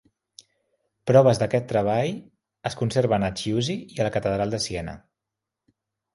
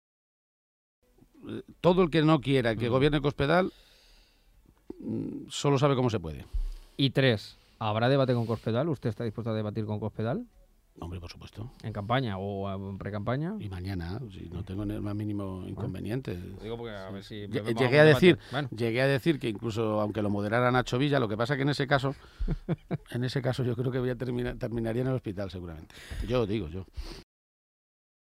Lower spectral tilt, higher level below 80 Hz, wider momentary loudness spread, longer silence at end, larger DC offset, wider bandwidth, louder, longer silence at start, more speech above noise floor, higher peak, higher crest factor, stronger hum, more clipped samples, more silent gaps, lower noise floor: about the same, -6 dB/octave vs -7 dB/octave; second, -52 dBFS vs -46 dBFS; about the same, 15 LU vs 16 LU; first, 1.2 s vs 1 s; neither; second, 11.5 kHz vs 14.5 kHz; first, -24 LUFS vs -29 LUFS; second, 1.05 s vs 1.45 s; first, 63 dB vs 33 dB; first, -4 dBFS vs -8 dBFS; about the same, 22 dB vs 22 dB; neither; neither; neither; first, -86 dBFS vs -61 dBFS